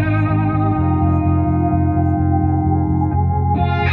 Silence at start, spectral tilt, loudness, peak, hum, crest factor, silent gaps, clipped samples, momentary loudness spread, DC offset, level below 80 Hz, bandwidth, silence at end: 0 s; -11 dB/octave; -17 LUFS; -4 dBFS; none; 12 dB; none; under 0.1%; 1 LU; under 0.1%; -24 dBFS; 4.4 kHz; 0 s